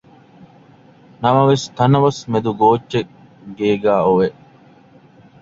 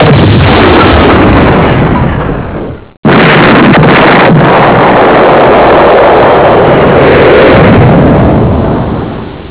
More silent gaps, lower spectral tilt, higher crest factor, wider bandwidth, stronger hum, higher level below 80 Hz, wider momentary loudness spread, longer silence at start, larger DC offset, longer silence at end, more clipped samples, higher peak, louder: second, none vs 2.97-3.03 s; second, -7 dB/octave vs -10.5 dB/octave; first, 18 dB vs 4 dB; first, 7.8 kHz vs 4 kHz; neither; second, -54 dBFS vs -18 dBFS; about the same, 9 LU vs 10 LU; first, 1.2 s vs 0 s; second, under 0.1% vs 1%; first, 1.1 s vs 0 s; second, under 0.1% vs 20%; about the same, 0 dBFS vs 0 dBFS; second, -16 LUFS vs -3 LUFS